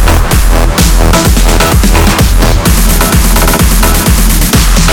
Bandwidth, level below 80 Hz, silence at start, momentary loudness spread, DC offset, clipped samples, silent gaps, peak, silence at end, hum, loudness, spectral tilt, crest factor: 18.5 kHz; -8 dBFS; 0 s; 1 LU; 1%; 0.6%; none; 0 dBFS; 0 s; none; -7 LUFS; -4 dB/octave; 6 dB